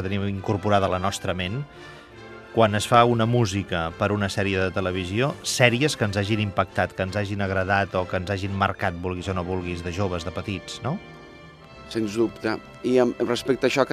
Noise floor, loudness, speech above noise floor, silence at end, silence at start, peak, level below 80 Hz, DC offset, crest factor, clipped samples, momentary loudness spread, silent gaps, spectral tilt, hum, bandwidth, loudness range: -45 dBFS; -24 LUFS; 21 dB; 0 s; 0 s; 0 dBFS; -54 dBFS; under 0.1%; 24 dB; under 0.1%; 12 LU; none; -5.5 dB/octave; none; 14.5 kHz; 7 LU